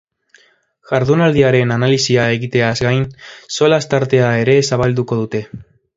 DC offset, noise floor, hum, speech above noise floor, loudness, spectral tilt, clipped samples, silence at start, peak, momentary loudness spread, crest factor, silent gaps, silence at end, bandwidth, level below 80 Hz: under 0.1%; -54 dBFS; none; 40 dB; -15 LUFS; -5.5 dB/octave; under 0.1%; 0.9 s; 0 dBFS; 8 LU; 16 dB; none; 0.35 s; 7.8 kHz; -46 dBFS